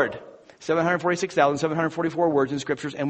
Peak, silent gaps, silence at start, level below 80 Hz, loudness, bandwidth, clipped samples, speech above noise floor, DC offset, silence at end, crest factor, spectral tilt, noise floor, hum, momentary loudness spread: -4 dBFS; none; 0 s; -62 dBFS; -24 LUFS; 8.4 kHz; under 0.1%; 20 dB; under 0.1%; 0 s; 20 dB; -5.5 dB/octave; -43 dBFS; none; 7 LU